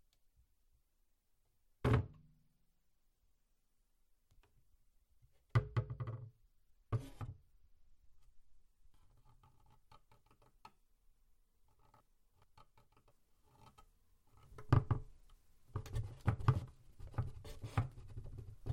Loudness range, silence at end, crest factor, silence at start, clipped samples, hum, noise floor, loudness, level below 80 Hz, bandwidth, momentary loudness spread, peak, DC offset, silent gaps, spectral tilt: 11 LU; 0 s; 28 dB; 1.85 s; under 0.1%; none; -78 dBFS; -41 LUFS; -56 dBFS; 11.5 kHz; 18 LU; -16 dBFS; under 0.1%; none; -8 dB/octave